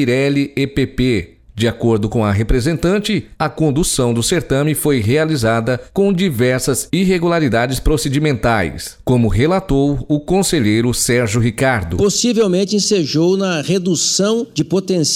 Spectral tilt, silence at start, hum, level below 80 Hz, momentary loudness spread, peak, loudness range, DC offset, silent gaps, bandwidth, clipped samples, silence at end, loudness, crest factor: -5 dB/octave; 0 s; none; -30 dBFS; 4 LU; -4 dBFS; 2 LU; under 0.1%; none; 16.5 kHz; under 0.1%; 0 s; -16 LUFS; 12 dB